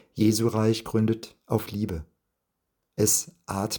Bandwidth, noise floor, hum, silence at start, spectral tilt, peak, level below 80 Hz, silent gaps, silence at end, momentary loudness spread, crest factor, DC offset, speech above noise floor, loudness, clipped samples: 19 kHz; -80 dBFS; none; 0.15 s; -5 dB/octave; -8 dBFS; -54 dBFS; none; 0 s; 11 LU; 20 dB; under 0.1%; 55 dB; -26 LUFS; under 0.1%